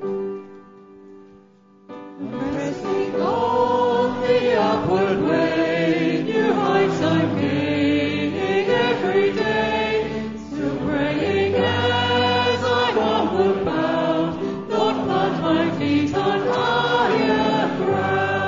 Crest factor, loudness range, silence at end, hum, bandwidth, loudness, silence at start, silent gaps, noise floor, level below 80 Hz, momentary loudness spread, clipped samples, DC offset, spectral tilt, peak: 14 dB; 2 LU; 0 s; none; 7.6 kHz; -20 LUFS; 0 s; none; -51 dBFS; -50 dBFS; 7 LU; under 0.1%; under 0.1%; -6 dB/octave; -6 dBFS